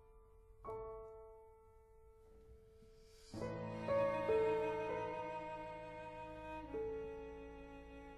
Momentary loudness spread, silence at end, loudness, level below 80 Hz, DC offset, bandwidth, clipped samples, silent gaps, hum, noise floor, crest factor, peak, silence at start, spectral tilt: 26 LU; 0 s; -43 LUFS; -64 dBFS; under 0.1%; 12 kHz; under 0.1%; none; none; -64 dBFS; 20 dB; -24 dBFS; 0 s; -6.5 dB/octave